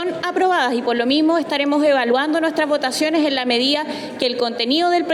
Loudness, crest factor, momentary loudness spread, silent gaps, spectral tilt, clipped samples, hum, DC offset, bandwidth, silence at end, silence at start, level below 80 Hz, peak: -18 LUFS; 12 dB; 5 LU; none; -3 dB/octave; under 0.1%; none; under 0.1%; 13.5 kHz; 0 s; 0 s; -68 dBFS; -6 dBFS